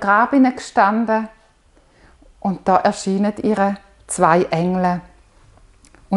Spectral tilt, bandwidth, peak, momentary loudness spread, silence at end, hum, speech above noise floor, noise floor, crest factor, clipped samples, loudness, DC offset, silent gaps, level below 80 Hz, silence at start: -6 dB/octave; 11.5 kHz; 0 dBFS; 11 LU; 0 s; none; 37 dB; -54 dBFS; 18 dB; under 0.1%; -18 LUFS; under 0.1%; none; -52 dBFS; 0 s